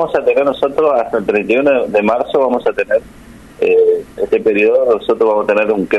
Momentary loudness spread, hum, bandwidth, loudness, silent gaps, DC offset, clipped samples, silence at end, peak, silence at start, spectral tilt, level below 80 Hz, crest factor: 5 LU; none; 11.5 kHz; -14 LUFS; none; under 0.1%; under 0.1%; 0 s; -2 dBFS; 0 s; -6.5 dB/octave; -48 dBFS; 10 dB